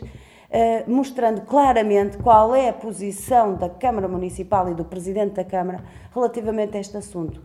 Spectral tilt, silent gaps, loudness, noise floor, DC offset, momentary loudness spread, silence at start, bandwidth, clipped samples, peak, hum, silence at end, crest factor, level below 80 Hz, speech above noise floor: -6.5 dB/octave; none; -21 LUFS; -41 dBFS; under 0.1%; 14 LU; 0 s; 14 kHz; under 0.1%; -2 dBFS; none; 0.05 s; 20 dB; -44 dBFS; 21 dB